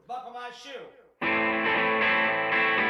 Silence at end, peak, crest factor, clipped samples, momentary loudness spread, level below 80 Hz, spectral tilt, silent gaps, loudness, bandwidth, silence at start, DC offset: 0 s; -14 dBFS; 14 dB; under 0.1%; 18 LU; -64 dBFS; -4.5 dB/octave; none; -24 LUFS; 10.5 kHz; 0.1 s; under 0.1%